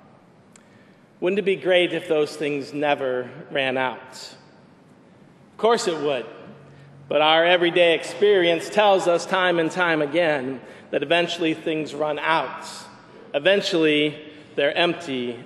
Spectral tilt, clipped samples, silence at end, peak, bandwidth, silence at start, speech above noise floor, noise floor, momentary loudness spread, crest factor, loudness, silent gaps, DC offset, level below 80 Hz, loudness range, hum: -4 dB/octave; under 0.1%; 0 s; -4 dBFS; 12.5 kHz; 1.2 s; 30 dB; -52 dBFS; 13 LU; 20 dB; -21 LUFS; none; under 0.1%; -74 dBFS; 7 LU; none